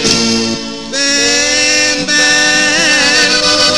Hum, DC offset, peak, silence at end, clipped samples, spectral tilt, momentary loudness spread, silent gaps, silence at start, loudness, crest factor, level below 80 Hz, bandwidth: none; 1%; 0 dBFS; 0 s; 0.2%; -1 dB/octave; 7 LU; none; 0 s; -9 LUFS; 12 dB; -42 dBFS; over 20 kHz